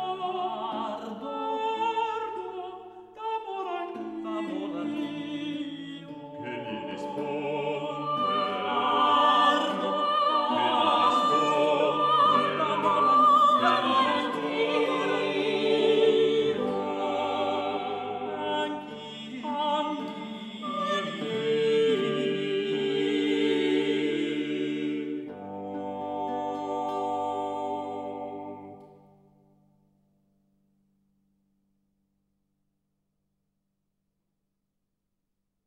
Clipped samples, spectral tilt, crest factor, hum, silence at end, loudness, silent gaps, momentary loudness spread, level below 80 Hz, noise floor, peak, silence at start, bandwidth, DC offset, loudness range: under 0.1%; -5 dB/octave; 18 dB; none; 6.8 s; -27 LUFS; none; 15 LU; -78 dBFS; -81 dBFS; -10 dBFS; 0 s; 11 kHz; under 0.1%; 12 LU